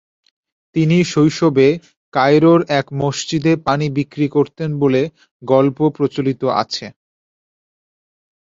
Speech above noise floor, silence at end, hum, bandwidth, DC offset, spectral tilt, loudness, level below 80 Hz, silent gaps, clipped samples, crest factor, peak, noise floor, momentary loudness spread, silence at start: over 75 dB; 1.55 s; none; 7.8 kHz; under 0.1%; -6.5 dB/octave; -16 LUFS; -56 dBFS; 1.97-2.12 s, 5.31-5.40 s; under 0.1%; 16 dB; -2 dBFS; under -90 dBFS; 11 LU; 0.75 s